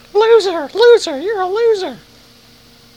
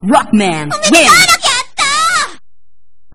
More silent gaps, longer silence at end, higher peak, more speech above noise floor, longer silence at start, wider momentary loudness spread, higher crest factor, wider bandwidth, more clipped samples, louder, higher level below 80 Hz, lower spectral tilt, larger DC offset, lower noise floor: neither; first, 1 s vs 0.8 s; about the same, 0 dBFS vs 0 dBFS; second, 31 dB vs 55 dB; first, 0.15 s vs 0 s; about the same, 10 LU vs 10 LU; about the same, 14 dB vs 12 dB; second, 10.5 kHz vs over 20 kHz; second, under 0.1% vs 0.6%; second, -13 LUFS vs -9 LUFS; second, -56 dBFS vs -42 dBFS; about the same, -2.5 dB/octave vs -2 dB/octave; second, under 0.1% vs 3%; second, -45 dBFS vs -64 dBFS